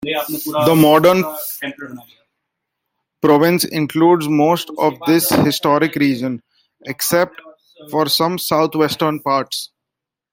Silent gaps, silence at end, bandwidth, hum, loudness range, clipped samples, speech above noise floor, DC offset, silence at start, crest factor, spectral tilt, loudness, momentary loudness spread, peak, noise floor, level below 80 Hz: none; 0.65 s; 16.5 kHz; none; 3 LU; under 0.1%; 67 dB; under 0.1%; 0 s; 16 dB; -5 dB/octave; -16 LUFS; 13 LU; 0 dBFS; -83 dBFS; -58 dBFS